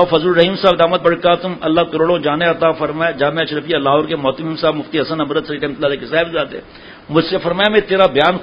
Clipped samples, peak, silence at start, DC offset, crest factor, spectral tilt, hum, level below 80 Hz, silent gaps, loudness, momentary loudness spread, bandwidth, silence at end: under 0.1%; 0 dBFS; 0 s; under 0.1%; 16 dB; -7.5 dB/octave; none; -46 dBFS; none; -15 LUFS; 7 LU; 6 kHz; 0 s